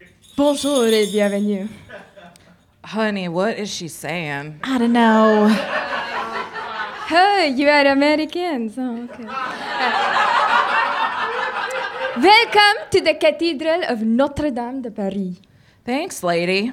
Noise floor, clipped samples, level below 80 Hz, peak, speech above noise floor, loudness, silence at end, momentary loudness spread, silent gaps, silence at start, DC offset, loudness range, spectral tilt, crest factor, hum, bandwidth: -51 dBFS; under 0.1%; -54 dBFS; -2 dBFS; 33 dB; -18 LUFS; 0 s; 13 LU; none; 0.35 s; under 0.1%; 6 LU; -4 dB/octave; 18 dB; none; 16.5 kHz